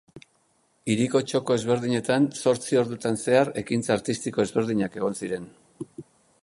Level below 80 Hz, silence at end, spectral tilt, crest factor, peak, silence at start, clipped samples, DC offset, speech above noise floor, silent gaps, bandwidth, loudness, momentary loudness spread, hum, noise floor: -62 dBFS; 0.4 s; -5.5 dB/octave; 20 dB; -6 dBFS; 0.15 s; under 0.1%; under 0.1%; 42 dB; none; 11.5 kHz; -25 LUFS; 12 LU; none; -67 dBFS